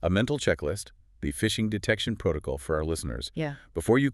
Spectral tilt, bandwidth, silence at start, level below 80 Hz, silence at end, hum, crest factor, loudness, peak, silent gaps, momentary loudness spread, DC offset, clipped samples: -5 dB/octave; 13.5 kHz; 0 s; -42 dBFS; 0 s; none; 20 dB; -29 LUFS; -8 dBFS; none; 9 LU; under 0.1%; under 0.1%